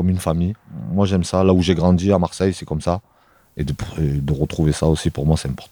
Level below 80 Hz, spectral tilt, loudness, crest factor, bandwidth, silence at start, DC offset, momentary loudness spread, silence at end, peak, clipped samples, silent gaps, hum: -34 dBFS; -7 dB/octave; -19 LUFS; 18 dB; 19.5 kHz; 0 s; under 0.1%; 10 LU; 0.05 s; -2 dBFS; under 0.1%; none; none